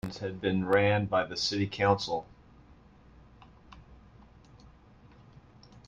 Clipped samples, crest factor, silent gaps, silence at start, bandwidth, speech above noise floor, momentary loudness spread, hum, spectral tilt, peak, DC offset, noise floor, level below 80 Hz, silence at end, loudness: under 0.1%; 22 dB; none; 0.05 s; 10.5 kHz; 28 dB; 9 LU; none; -5.5 dB/octave; -10 dBFS; under 0.1%; -56 dBFS; -58 dBFS; 0.1 s; -29 LUFS